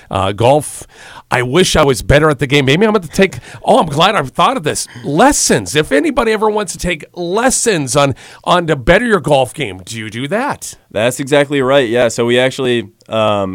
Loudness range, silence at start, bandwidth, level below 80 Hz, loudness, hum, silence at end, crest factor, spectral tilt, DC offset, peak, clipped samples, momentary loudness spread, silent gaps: 3 LU; 0.1 s; 17 kHz; -34 dBFS; -13 LUFS; none; 0 s; 14 dB; -4 dB/octave; under 0.1%; 0 dBFS; 0.1%; 10 LU; none